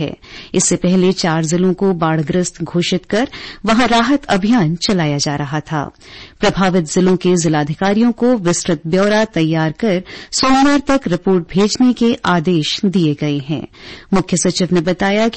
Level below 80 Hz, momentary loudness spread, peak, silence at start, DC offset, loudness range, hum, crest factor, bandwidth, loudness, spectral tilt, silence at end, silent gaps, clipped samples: -42 dBFS; 8 LU; -2 dBFS; 0 s; 0.5%; 2 LU; none; 12 dB; 8.8 kHz; -15 LUFS; -5 dB/octave; 0 s; none; under 0.1%